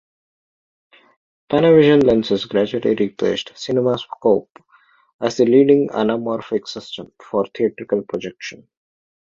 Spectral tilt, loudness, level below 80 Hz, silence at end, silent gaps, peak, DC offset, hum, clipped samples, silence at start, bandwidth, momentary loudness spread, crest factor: -6.5 dB/octave; -18 LUFS; -56 dBFS; 0.85 s; 4.50-4.55 s, 5.13-5.19 s; -2 dBFS; under 0.1%; none; under 0.1%; 1.5 s; 7.6 kHz; 16 LU; 18 dB